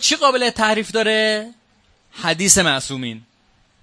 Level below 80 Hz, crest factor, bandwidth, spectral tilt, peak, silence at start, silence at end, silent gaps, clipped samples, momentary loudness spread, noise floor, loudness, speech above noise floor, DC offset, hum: -50 dBFS; 20 dB; 11 kHz; -2 dB/octave; 0 dBFS; 0 s; 0.65 s; none; under 0.1%; 16 LU; -58 dBFS; -17 LUFS; 40 dB; under 0.1%; none